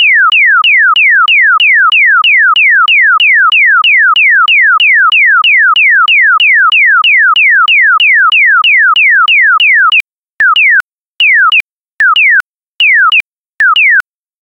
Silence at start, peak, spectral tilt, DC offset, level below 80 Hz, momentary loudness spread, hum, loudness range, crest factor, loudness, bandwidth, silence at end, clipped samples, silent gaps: 0 s; 0 dBFS; 2 dB/octave; under 0.1%; -62 dBFS; 4 LU; none; 3 LU; 6 dB; -4 LUFS; 11 kHz; 0.4 s; under 0.1%; 10.03-10.08 s, 10.18-10.33 s, 10.84-11.17 s, 11.60-11.77 s, 11.83-11.98 s, 12.48-12.54 s, 12.62-12.73 s, 13.33-13.45 s